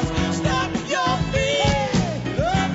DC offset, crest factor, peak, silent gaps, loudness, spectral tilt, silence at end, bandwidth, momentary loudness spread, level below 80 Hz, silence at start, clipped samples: under 0.1%; 14 dB; -6 dBFS; none; -21 LUFS; -5 dB/octave; 0 s; 8 kHz; 4 LU; -34 dBFS; 0 s; under 0.1%